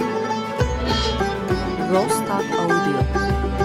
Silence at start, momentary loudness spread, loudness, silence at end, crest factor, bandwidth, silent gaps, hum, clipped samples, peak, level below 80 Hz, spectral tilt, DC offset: 0 s; 4 LU; -21 LUFS; 0 s; 14 dB; 15.5 kHz; none; none; under 0.1%; -6 dBFS; -30 dBFS; -5.5 dB/octave; under 0.1%